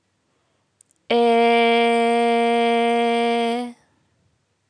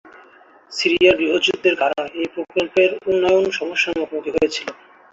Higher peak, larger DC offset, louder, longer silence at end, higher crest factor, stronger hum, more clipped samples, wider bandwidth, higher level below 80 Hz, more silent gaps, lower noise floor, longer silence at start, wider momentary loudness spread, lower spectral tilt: second, -6 dBFS vs -2 dBFS; neither; about the same, -18 LUFS vs -18 LUFS; first, 0.95 s vs 0.4 s; about the same, 14 dB vs 18 dB; neither; neither; first, 10.5 kHz vs 7.8 kHz; second, -82 dBFS vs -54 dBFS; neither; first, -68 dBFS vs -49 dBFS; first, 1.1 s vs 0.05 s; second, 7 LU vs 11 LU; about the same, -4 dB/octave vs -3.5 dB/octave